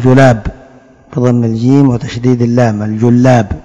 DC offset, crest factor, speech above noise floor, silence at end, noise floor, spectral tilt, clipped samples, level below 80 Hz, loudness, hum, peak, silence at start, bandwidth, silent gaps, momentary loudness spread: under 0.1%; 10 dB; 31 dB; 0 s; -39 dBFS; -8 dB/octave; 3%; -32 dBFS; -10 LUFS; none; 0 dBFS; 0 s; 7.8 kHz; none; 7 LU